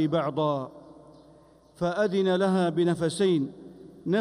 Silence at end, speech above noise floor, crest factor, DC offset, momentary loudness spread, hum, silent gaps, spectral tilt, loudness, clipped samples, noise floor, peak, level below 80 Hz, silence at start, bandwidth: 0 s; 30 dB; 14 dB; under 0.1%; 15 LU; none; none; -6.5 dB/octave; -26 LUFS; under 0.1%; -56 dBFS; -12 dBFS; -64 dBFS; 0 s; 11.5 kHz